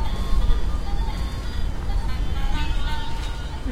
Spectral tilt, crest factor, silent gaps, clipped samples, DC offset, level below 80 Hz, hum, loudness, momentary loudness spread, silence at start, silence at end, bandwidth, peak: -5.5 dB/octave; 16 dB; none; under 0.1%; under 0.1%; -24 dBFS; none; -28 LUFS; 5 LU; 0 s; 0 s; 10.5 kHz; -6 dBFS